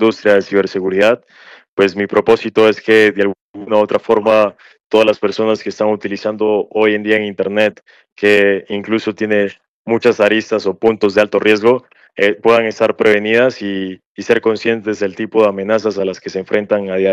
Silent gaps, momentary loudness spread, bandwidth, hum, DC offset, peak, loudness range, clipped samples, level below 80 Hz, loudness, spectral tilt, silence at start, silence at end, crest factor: 1.68-1.77 s, 3.41-3.54 s, 4.86-4.90 s, 8.12-8.16 s, 9.68-9.85 s, 14.06-14.15 s; 8 LU; 10 kHz; none; under 0.1%; 0 dBFS; 2 LU; under 0.1%; -58 dBFS; -14 LUFS; -5.5 dB/octave; 0 s; 0 s; 14 dB